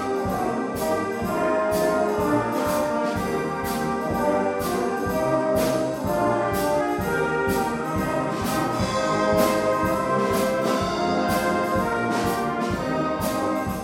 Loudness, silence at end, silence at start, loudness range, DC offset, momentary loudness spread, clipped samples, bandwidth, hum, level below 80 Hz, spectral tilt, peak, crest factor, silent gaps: -23 LUFS; 0 s; 0 s; 2 LU; under 0.1%; 4 LU; under 0.1%; 17 kHz; none; -44 dBFS; -5.5 dB/octave; -6 dBFS; 16 dB; none